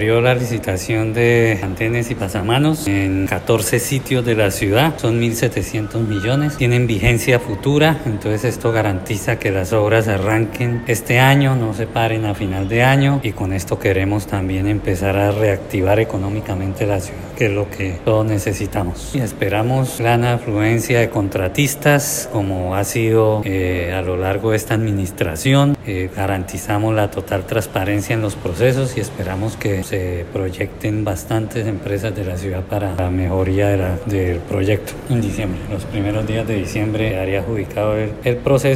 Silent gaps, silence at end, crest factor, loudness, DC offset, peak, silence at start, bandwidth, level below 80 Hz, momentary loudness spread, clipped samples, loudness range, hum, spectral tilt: none; 0 s; 18 dB; -18 LUFS; under 0.1%; 0 dBFS; 0 s; 16 kHz; -38 dBFS; 8 LU; under 0.1%; 4 LU; none; -6 dB/octave